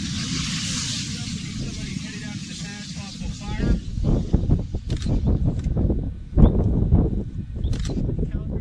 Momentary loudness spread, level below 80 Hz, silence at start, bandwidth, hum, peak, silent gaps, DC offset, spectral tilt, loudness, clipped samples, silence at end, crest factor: 12 LU; -26 dBFS; 0 s; 11 kHz; none; -2 dBFS; none; under 0.1%; -5.5 dB/octave; -25 LUFS; under 0.1%; 0 s; 22 dB